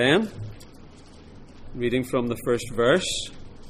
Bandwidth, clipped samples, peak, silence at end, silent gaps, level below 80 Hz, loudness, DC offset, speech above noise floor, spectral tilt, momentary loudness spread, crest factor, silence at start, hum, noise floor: 15.5 kHz; under 0.1%; -6 dBFS; 0 s; none; -44 dBFS; -24 LUFS; under 0.1%; 22 dB; -4.5 dB/octave; 19 LU; 20 dB; 0 s; none; -46 dBFS